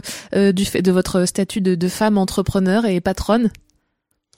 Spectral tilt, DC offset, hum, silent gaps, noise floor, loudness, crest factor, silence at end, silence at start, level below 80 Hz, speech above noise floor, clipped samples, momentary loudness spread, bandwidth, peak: -5.5 dB/octave; under 0.1%; none; none; -71 dBFS; -18 LUFS; 14 dB; 0.85 s; 0.05 s; -40 dBFS; 54 dB; under 0.1%; 3 LU; 16.5 kHz; -4 dBFS